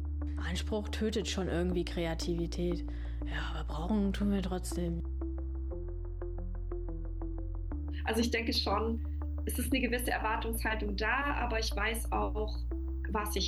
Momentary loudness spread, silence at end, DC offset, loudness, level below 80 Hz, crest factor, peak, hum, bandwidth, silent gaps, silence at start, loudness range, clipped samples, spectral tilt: 10 LU; 0 s; under 0.1%; -35 LUFS; -38 dBFS; 14 dB; -20 dBFS; none; 13 kHz; none; 0 s; 5 LU; under 0.1%; -5 dB/octave